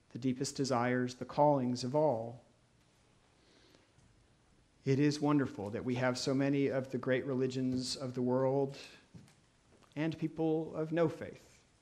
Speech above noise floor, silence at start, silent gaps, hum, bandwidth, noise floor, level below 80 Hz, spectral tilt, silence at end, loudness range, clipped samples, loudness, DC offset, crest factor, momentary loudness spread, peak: 35 dB; 0.15 s; none; none; 12.5 kHz; -68 dBFS; -72 dBFS; -6 dB/octave; 0.45 s; 5 LU; under 0.1%; -34 LUFS; under 0.1%; 20 dB; 9 LU; -16 dBFS